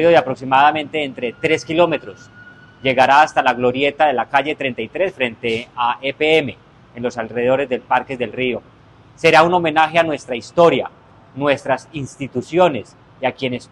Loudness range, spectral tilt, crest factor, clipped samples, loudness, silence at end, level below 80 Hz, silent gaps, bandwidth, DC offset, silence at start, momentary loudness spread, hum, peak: 3 LU; -5 dB/octave; 18 dB; under 0.1%; -17 LUFS; 0.05 s; -54 dBFS; none; 11.5 kHz; under 0.1%; 0 s; 12 LU; none; 0 dBFS